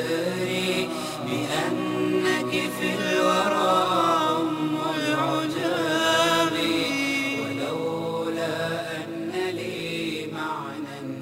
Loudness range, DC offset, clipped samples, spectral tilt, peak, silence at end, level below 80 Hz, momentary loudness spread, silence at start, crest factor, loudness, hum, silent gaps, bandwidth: 6 LU; under 0.1%; under 0.1%; -4 dB/octave; -8 dBFS; 0 s; -64 dBFS; 9 LU; 0 s; 16 dB; -25 LUFS; none; none; 16 kHz